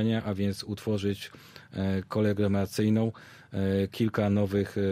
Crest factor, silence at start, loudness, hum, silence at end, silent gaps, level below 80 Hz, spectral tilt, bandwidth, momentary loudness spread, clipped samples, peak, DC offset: 14 dB; 0 s; -29 LUFS; none; 0 s; none; -60 dBFS; -7 dB/octave; 15.5 kHz; 12 LU; under 0.1%; -14 dBFS; under 0.1%